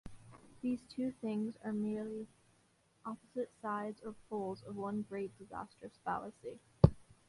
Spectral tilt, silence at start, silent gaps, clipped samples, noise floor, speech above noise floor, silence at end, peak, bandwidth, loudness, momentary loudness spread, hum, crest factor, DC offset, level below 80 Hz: -9 dB/octave; 0.05 s; none; under 0.1%; -72 dBFS; 31 dB; 0.25 s; -8 dBFS; 11.5 kHz; -39 LUFS; 18 LU; none; 30 dB; under 0.1%; -54 dBFS